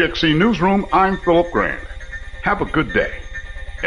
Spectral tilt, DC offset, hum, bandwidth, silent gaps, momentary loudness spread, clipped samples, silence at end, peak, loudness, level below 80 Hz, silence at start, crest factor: -6.5 dB/octave; under 0.1%; none; 10.5 kHz; none; 17 LU; under 0.1%; 0 s; -4 dBFS; -17 LUFS; -32 dBFS; 0 s; 14 dB